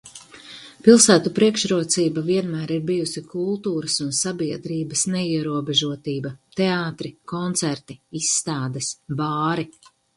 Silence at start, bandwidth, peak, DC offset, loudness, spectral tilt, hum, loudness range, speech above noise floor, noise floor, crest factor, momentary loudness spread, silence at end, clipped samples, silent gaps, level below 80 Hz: 0.05 s; 11.5 kHz; 0 dBFS; under 0.1%; -21 LUFS; -4 dB/octave; none; 6 LU; 21 dB; -43 dBFS; 22 dB; 15 LU; 0.45 s; under 0.1%; none; -62 dBFS